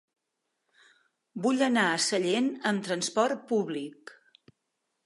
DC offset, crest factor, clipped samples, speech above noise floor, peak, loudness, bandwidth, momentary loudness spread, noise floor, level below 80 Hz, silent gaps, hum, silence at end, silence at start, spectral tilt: under 0.1%; 20 dB; under 0.1%; 54 dB; -10 dBFS; -28 LUFS; 11.5 kHz; 11 LU; -82 dBFS; -82 dBFS; none; none; 0.95 s; 1.35 s; -3.5 dB/octave